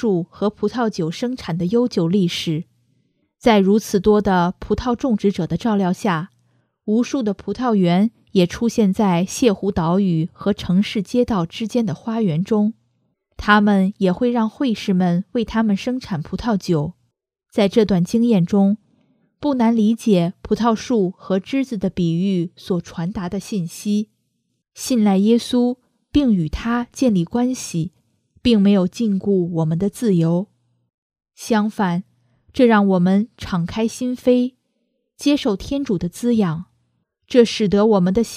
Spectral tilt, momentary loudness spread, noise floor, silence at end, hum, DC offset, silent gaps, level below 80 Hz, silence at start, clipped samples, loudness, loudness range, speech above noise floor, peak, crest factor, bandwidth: -6.5 dB/octave; 9 LU; -71 dBFS; 0 s; none; under 0.1%; 30.94-31.10 s; -44 dBFS; 0 s; under 0.1%; -19 LUFS; 3 LU; 53 dB; 0 dBFS; 18 dB; 14.5 kHz